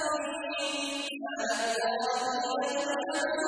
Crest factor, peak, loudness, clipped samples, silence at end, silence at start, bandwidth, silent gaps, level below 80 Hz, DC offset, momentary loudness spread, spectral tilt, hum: 14 dB; -18 dBFS; -31 LUFS; under 0.1%; 0 s; 0 s; 11 kHz; none; -74 dBFS; under 0.1%; 4 LU; -1 dB/octave; none